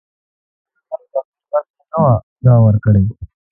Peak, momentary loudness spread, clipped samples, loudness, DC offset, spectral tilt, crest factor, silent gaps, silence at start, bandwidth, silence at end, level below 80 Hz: 0 dBFS; 17 LU; under 0.1%; -15 LUFS; under 0.1%; -15.5 dB/octave; 14 dB; 1.25-1.32 s, 1.70-1.74 s, 2.23-2.36 s; 0.9 s; 1.8 kHz; 0.25 s; -36 dBFS